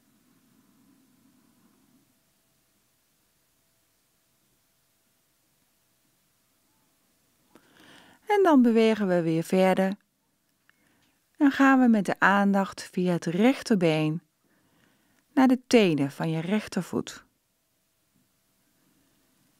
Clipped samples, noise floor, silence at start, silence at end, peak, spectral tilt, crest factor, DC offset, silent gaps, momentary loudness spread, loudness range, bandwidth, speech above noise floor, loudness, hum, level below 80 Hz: under 0.1%; -73 dBFS; 8.3 s; 2.4 s; -4 dBFS; -6 dB/octave; 24 dB; under 0.1%; none; 11 LU; 5 LU; 15 kHz; 50 dB; -24 LUFS; none; -72 dBFS